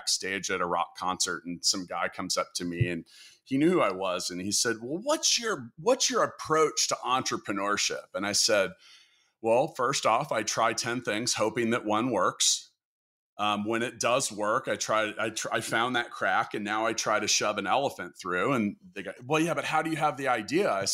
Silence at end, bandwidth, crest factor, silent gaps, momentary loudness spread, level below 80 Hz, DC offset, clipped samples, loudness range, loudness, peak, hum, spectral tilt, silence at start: 0 s; 16 kHz; 18 dB; 12.85-13.37 s; 7 LU; -68 dBFS; under 0.1%; under 0.1%; 2 LU; -28 LUFS; -12 dBFS; none; -2.5 dB/octave; 0 s